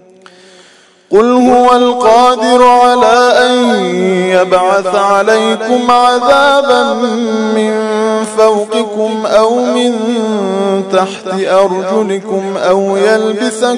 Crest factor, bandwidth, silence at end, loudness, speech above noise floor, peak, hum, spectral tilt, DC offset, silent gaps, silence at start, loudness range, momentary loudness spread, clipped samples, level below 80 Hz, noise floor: 10 dB; 12 kHz; 0 s; -10 LUFS; 34 dB; 0 dBFS; none; -4.5 dB/octave; under 0.1%; none; 1.1 s; 4 LU; 7 LU; 2%; -50 dBFS; -43 dBFS